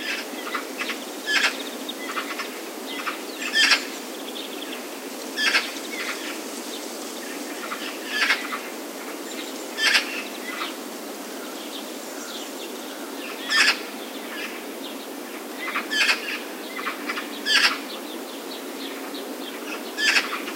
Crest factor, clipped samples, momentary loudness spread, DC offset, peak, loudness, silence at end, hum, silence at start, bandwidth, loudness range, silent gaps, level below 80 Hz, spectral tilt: 24 dB; under 0.1%; 14 LU; under 0.1%; -4 dBFS; -25 LUFS; 0 s; none; 0 s; 16 kHz; 4 LU; none; under -90 dBFS; 0 dB/octave